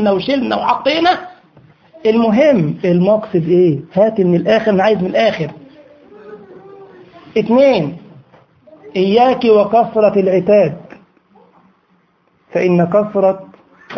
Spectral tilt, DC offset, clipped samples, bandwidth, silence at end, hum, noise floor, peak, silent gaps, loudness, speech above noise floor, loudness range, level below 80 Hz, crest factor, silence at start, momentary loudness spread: -8 dB/octave; under 0.1%; under 0.1%; 6.6 kHz; 0 s; none; -57 dBFS; 0 dBFS; none; -13 LUFS; 45 dB; 5 LU; -54 dBFS; 14 dB; 0 s; 9 LU